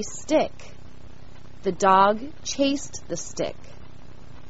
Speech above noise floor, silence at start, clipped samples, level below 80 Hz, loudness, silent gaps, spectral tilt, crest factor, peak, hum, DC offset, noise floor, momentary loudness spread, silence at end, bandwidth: 23 dB; 0 s; under 0.1%; -50 dBFS; -24 LUFS; none; -3.5 dB/octave; 22 dB; -4 dBFS; none; 2%; -46 dBFS; 15 LU; 0.35 s; 8 kHz